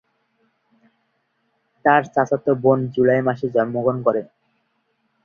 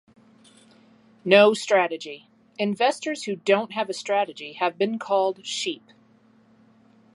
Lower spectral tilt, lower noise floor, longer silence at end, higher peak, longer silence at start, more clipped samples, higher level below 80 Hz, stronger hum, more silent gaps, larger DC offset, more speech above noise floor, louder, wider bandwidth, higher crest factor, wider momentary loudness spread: first, -8 dB/octave vs -4 dB/octave; first, -69 dBFS vs -58 dBFS; second, 1 s vs 1.4 s; about the same, -2 dBFS vs -2 dBFS; first, 1.85 s vs 1.25 s; neither; first, -62 dBFS vs -78 dBFS; neither; neither; neither; first, 51 dB vs 35 dB; first, -19 LUFS vs -23 LUFS; second, 6.8 kHz vs 11.5 kHz; about the same, 20 dB vs 24 dB; second, 4 LU vs 18 LU